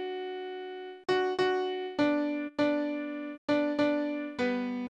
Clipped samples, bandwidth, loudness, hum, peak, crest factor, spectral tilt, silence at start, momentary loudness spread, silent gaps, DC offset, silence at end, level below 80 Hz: under 0.1%; 8.4 kHz; -31 LUFS; none; -16 dBFS; 16 dB; -5.5 dB/octave; 0 s; 10 LU; 3.38-3.48 s; under 0.1%; 0.05 s; -72 dBFS